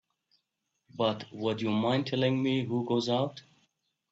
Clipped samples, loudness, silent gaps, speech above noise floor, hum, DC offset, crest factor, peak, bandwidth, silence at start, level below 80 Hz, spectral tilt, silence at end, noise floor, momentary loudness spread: under 0.1%; -30 LUFS; none; 52 dB; none; under 0.1%; 18 dB; -14 dBFS; 7.8 kHz; 0.95 s; -72 dBFS; -6.5 dB/octave; 0.7 s; -82 dBFS; 6 LU